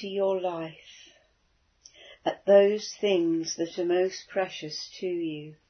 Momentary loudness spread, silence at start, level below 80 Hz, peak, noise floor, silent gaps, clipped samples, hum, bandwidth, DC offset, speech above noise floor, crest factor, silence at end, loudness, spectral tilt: 15 LU; 0 s; -74 dBFS; -8 dBFS; -69 dBFS; none; under 0.1%; none; 6.6 kHz; under 0.1%; 42 dB; 20 dB; 0.15 s; -27 LUFS; -4.5 dB/octave